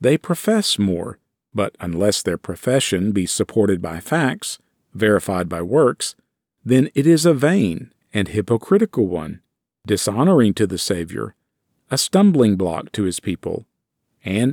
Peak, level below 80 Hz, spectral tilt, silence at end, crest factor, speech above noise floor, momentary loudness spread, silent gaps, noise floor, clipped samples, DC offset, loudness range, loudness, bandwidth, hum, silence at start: -4 dBFS; -52 dBFS; -5 dB/octave; 0 s; 16 dB; 55 dB; 13 LU; none; -73 dBFS; under 0.1%; under 0.1%; 2 LU; -19 LUFS; 19 kHz; none; 0 s